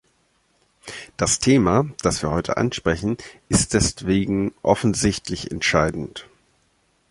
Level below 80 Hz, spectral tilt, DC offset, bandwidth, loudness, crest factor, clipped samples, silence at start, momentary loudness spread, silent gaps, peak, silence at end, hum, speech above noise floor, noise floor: -40 dBFS; -4.5 dB/octave; under 0.1%; 11.5 kHz; -21 LUFS; 20 dB; under 0.1%; 0.85 s; 16 LU; none; -2 dBFS; 0.9 s; none; 44 dB; -64 dBFS